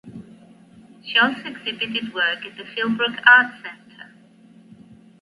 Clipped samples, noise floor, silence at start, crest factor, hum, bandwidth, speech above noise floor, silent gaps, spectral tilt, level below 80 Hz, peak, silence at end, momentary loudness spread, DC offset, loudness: under 0.1%; -50 dBFS; 0.05 s; 22 dB; none; 11.5 kHz; 30 dB; none; -4.5 dB/octave; -70 dBFS; 0 dBFS; 1.15 s; 24 LU; under 0.1%; -19 LUFS